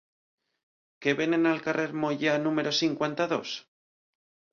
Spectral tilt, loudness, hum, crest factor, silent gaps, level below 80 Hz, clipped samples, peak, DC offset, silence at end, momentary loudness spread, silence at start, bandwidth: -4.5 dB/octave; -27 LUFS; none; 18 dB; none; -74 dBFS; under 0.1%; -12 dBFS; under 0.1%; 0.95 s; 7 LU; 1 s; 7.2 kHz